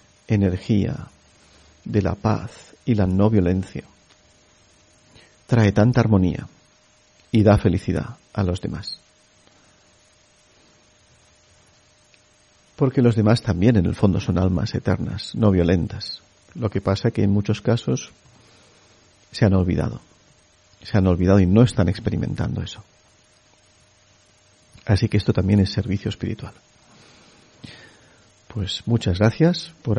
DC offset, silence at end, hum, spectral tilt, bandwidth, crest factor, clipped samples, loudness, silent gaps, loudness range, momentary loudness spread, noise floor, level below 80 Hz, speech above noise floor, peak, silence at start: under 0.1%; 0 s; none; -7.5 dB/octave; 10.5 kHz; 20 dB; under 0.1%; -21 LUFS; none; 8 LU; 17 LU; -57 dBFS; -42 dBFS; 37 dB; -2 dBFS; 0.3 s